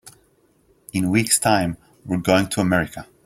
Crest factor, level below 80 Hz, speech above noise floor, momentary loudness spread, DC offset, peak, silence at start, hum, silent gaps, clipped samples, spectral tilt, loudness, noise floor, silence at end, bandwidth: 20 dB; -50 dBFS; 40 dB; 12 LU; under 0.1%; -2 dBFS; 0.05 s; none; none; under 0.1%; -4 dB/octave; -20 LUFS; -60 dBFS; 0.2 s; 16 kHz